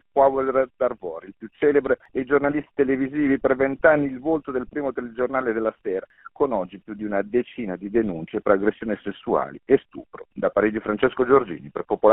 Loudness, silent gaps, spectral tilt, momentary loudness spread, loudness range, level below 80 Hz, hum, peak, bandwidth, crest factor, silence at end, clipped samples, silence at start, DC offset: -23 LUFS; none; -5.5 dB/octave; 12 LU; 5 LU; -54 dBFS; none; -2 dBFS; 4 kHz; 20 dB; 0 s; under 0.1%; 0.15 s; under 0.1%